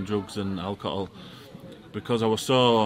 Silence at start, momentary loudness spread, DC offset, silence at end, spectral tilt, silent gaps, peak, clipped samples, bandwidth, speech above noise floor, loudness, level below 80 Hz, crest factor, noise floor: 0 s; 23 LU; under 0.1%; 0 s; -5.5 dB/octave; none; -6 dBFS; under 0.1%; 16 kHz; 19 dB; -27 LUFS; -60 dBFS; 20 dB; -45 dBFS